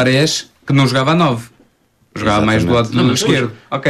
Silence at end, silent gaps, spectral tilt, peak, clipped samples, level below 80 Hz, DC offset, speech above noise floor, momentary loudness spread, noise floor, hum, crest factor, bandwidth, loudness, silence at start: 0 s; none; -5 dB/octave; -2 dBFS; under 0.1%; -42 dBFS; under 0.1%; 42 dB; 8 LU; -56 dBFS; none; 14 dB; 14 kHz; -14 LUFS; 0 s